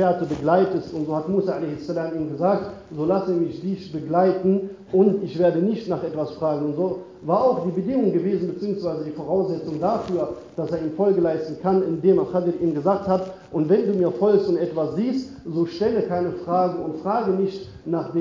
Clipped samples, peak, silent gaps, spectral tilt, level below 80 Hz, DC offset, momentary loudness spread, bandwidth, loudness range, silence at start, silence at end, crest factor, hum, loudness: under 0.1%; -6 dBFS; none; -9 dB/octave; -56 dBFS; under 0.1%; 8 LU; 7.4 kHz; 3 LU; 0 s; 0 s; 16 dB; none; -23 LUFS